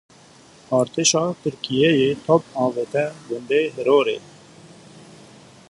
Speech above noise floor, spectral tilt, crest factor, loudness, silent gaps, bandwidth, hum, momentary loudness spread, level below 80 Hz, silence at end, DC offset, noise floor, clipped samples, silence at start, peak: 29 dB; -4 dB/octave; 20 dB; -20 LUFS; none; 11.5 kHz; none; 8 LU; -62 dBFS; 1.55 s; under 0.1%; -49 dBFS; under 0.1%; 0.7 s; -2 dBFS